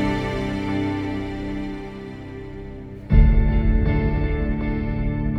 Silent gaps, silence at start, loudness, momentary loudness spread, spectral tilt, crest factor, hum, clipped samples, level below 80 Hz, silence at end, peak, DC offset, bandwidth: none; 0 s; -23 LUFS; 17 LU; -8.5 dB/octave; 18 dB; none; under 0.1%; -24 dBFS; 0 s; -4 dBFS; under 0.1%; 6.2 kHz